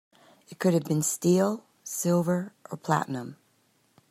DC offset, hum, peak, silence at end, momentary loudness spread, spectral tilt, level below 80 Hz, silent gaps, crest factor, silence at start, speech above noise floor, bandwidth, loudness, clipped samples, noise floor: under 0.1%; none; -8 dBFS; 0.75 s; 14 LU; -5.5 dB/octave; -72 dBFS; none; 20 dB; 0.5 s; 41 dB; 15 kHz; -27 LUFS; under 0.1%; -67 dBFS